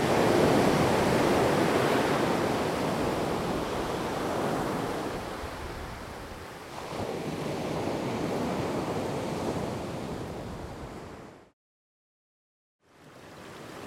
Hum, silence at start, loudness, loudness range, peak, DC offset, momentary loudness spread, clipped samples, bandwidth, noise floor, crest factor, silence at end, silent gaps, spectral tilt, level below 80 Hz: none; 0 s; -29 LUFS; 15 LU; -10 dBFS; under 0.1%; 17 LU; under 0.1%; 16 kHz; -51 dBFS; 18 dB; 0 s; 11.53-12.79 s; -5.5 dB/octave; -50 dBFS